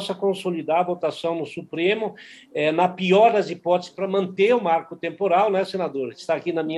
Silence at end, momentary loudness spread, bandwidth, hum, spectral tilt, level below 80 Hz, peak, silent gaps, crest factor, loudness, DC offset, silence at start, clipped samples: 0 s; 9 LU; 12 kHz; none; -6 dB/octave; -74 dBFS; -6 dBFS; none; 16 dB; -22 LUFS; under 0.1%; 0 s; under 0.1%